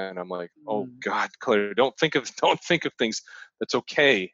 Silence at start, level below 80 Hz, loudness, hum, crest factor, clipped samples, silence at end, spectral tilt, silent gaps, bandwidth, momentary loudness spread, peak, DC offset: 0 s; -70 dBFS; -25 LUFS; none; 20 dB; under 0.1%; 0.05 s; -3.5 dB/octave; none; 8 kHz; 13 LU; -6 dBFS; under 0.1%